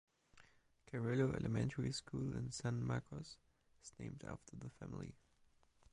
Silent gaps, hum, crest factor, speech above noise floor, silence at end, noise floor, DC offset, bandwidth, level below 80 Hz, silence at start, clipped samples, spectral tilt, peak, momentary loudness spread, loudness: none; none; 20 dB; 30 dB; 0.8 s; -73 dBFS; under 0.1%; 11 kHz; -64 dBFS; 0.35 s; under 0.1%; -6 dB/octave; -24 dBFS; 16 LU; -44 LUFS